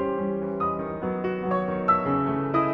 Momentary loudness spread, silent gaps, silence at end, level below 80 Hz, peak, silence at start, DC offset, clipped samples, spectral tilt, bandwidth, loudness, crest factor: 6 LU; none; 0 s; -54 dBFS; -10 dBFS; 0 s; under 0.1%; under 0.1%; -10 dB/octave; 5.6 kHz; -26 LUFS; 16 dB